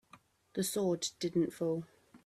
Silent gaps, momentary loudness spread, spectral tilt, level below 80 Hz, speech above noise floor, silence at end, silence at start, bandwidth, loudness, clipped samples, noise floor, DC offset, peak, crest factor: none; 8 LU; -5 dB/octave; -74 dBFS; 29 dB; 0.1 s; 0.15 s; 15.5 kHz; -35 LUFS; under 0.1%; -63 dBFS; under 0.1%; -20 dBFS; 16 dB